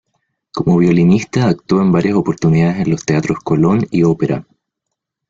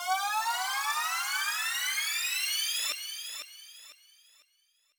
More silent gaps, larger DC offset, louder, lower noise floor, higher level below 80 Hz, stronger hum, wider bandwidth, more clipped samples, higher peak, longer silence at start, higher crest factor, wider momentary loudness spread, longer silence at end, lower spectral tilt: neither; neither; first, -14 LUFS vs -30 LUFS; first, -78 dBFS vs -71 dBFS; first, -46 dBFS vs -88 dBFS; neither; second, 7.6 kHz vs over 20 kHz; neither; first, -2 dBFS vs -18 dBFS; first, 0.55 s vs 0 s; about the same, 12 dB vs 16 dB; second, 6 LU vs 14 LU; second, 0.85 s vs 1.05 s; first, -7.5 dB/octave vs 5.5 dB/octave